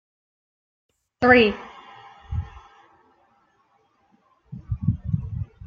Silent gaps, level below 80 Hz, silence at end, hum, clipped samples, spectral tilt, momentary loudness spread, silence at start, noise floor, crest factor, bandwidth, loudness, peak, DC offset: none; -44 dBFS; 0 s; none; under 0.1%; -8 dB/octave; 27 LU; 1.2 s; -64 dBFS; 24 dB; 6.8 kHz; -22 LUFS; -2 dBFS; under 0.1%